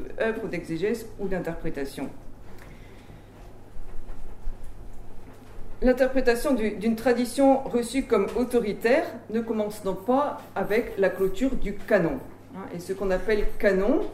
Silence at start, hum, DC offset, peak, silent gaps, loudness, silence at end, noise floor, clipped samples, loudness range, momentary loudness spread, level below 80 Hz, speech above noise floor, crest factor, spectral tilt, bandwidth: 0 s; none; under 0.1%; -8 dBFS; none; -26 LUFS; 0 s; -45 dBFS; under 0.1%; 17 LU; 23 LU; -38 dBFS; 20 dB; 18 dB; -6 dB/octave; 15.5 kHz